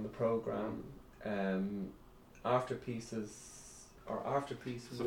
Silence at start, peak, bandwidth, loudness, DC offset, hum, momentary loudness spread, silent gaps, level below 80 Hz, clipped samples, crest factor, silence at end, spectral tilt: 0 s; -20 dBFS; 18 kHz; -39 LUFS; under 0.1%; none; 17 LU; none; -64 dBFS; under 0.1%; 20 dB; 0 s; -6 dB/octave